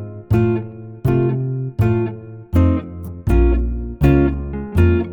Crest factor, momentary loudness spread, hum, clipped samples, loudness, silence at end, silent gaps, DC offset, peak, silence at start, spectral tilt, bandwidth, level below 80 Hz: 14 dB; 10 LU; none; under 0.1%; -18 LUFS; 0 s; none; under 0.1%; -4 dBFS; 0 s; -10 dB/octave; 19 kHz; -24 dBFS